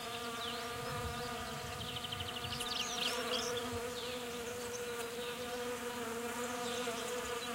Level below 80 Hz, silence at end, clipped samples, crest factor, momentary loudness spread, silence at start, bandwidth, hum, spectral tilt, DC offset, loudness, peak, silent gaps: -60 dBFS; 0 s; under 0.1%; 18 dB; 6 LU; 0 s; 16 kHz; none; -2.5 dB/octave; under 0.1%; -39 LUFS; -22 dBFS; none